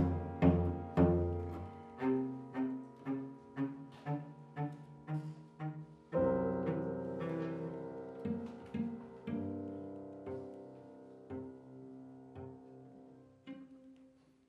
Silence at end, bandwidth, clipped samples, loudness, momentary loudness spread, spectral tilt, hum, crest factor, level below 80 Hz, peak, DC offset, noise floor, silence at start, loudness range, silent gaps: 0.4 s; 5.8 kHz; under 0.1%; -39 LUFS; 21 LU; -10 dB/octave; none; 24 dB; -56 dBFS; -14 dBFS; under 0.1%; -65 dBFS; 0 s; 14 LU; none